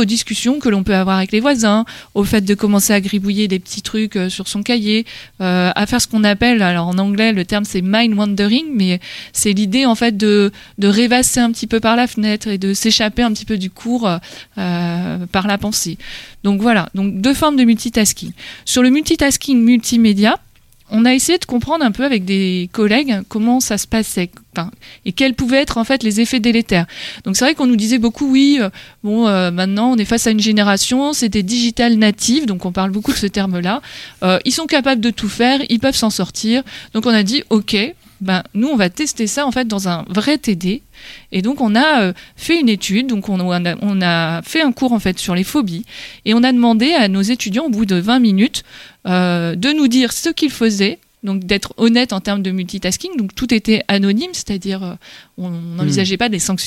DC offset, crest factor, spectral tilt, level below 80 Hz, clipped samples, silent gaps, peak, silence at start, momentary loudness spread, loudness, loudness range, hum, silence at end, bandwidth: under 0.1%; 14 dB; -4 dB/octave; -42 dBFS; under 0.1%; none; 0 dBFS; 0 s; 9 LU; -15 LUFS; 3 LU; none; 0 s; 16 kHz